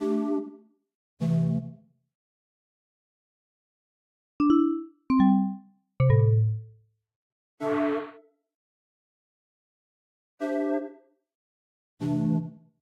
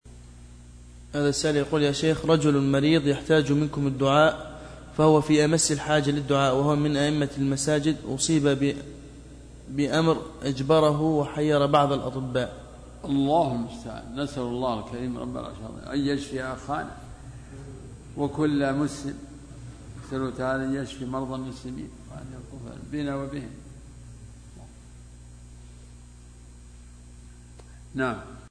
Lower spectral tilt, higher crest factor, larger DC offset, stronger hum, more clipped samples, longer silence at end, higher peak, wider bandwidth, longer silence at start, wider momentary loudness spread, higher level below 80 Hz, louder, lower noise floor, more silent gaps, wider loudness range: first, -10 dB/octave vs -5.5 dB/octave; about the same, 18 dB vs 20 dB; neither; second, none vs 60 Hz at -50 dBFS; neither; first, 0.25 s vs 0 s; second, -10 dBFS vs -6 dBFS; second, 7.2 kHz vs 10.5 kHz; about the same, 0 s vs 0.05 s; second, 15 LU vs 22 LU; second, -56 dBFS vs -48 dBFS; about the same, -26 LUFS vs -25 LUFS; first, -57 dBFS vs -47 dBFS; first, 0.95-1.17 s, 2.15-4.39 s, 7.16-7.58 s, 8.55-10.38 s, 11.35-11.97 s vs none; second, 11 LU vs 15 LU